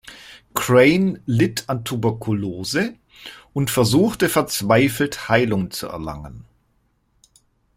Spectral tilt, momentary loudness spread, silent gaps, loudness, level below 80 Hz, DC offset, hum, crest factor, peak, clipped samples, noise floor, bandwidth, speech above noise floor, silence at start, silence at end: -5 dB/octave; 19 LU; none; -20 LUFS; -50 dBFS; under 0.1%; none; 18 dB; -2 dBFS; under 0.1%; -65 dBFS; 16 kHz; 45 dB; 0.05 s; 1.35 s